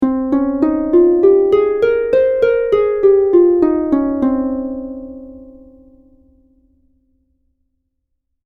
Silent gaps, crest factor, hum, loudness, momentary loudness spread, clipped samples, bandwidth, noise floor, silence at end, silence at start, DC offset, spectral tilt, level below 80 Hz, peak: none; 14 dB; none; -14 LUFS; 14 LU; under 0.1%; 4.5 kHz; -71 dBFS; 2.95 s; 0 s; under 0.1%; -8.5 dB/octave; -44 dBFS; 0 dBFS